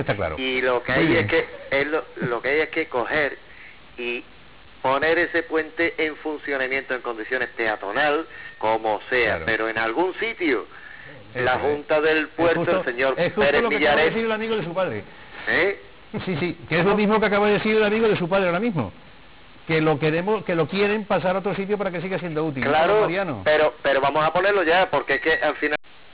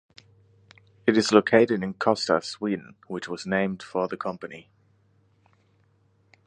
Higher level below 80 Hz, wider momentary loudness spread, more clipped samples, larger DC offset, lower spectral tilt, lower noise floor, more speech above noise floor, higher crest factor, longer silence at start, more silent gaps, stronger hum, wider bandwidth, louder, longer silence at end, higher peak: first, -50 dBFS vs -66 dBFS; second, 10 LU vs 17 LU; neither; first, 0.4% vs under 0.1%; first, -9 dB/octave vs -5 dB/octave; second, -48 dBFS vs -64 dBFS; second, 26 dB vs 40 dB; second, 8 dB vs 24 dB; second, 0 s vs 1.05 s; neither; neither; second, 4 kHz vs 10.5 kHz; first, -22 LUFS vs -25 LUFS; second, 0.35 s vs 1.85 s; second, -14 dBFS vs -2 dBFS